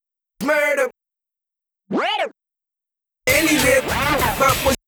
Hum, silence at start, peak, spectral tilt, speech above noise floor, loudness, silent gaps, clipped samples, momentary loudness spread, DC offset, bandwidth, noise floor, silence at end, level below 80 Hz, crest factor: none; 0.4 s; -4 dBFS; -3 dB/octave; 70 dB; -18 LUFS; none; under 0.1%; 10 LU; under 0.1%; over 20 kHz; -87 dBFS; 0.1 s; -40 dBFS; 18 dB